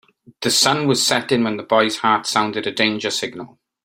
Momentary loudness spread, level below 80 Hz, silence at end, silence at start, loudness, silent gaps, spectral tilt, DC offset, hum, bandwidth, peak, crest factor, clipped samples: 9 LU; -62 dBFS; 0.4 s; 0.4 s; -18 LUFS; none; -3 dB/octave; under 0.1%; none; 16.5 kHz; -2 dBFS; 18 dB; under 0.1%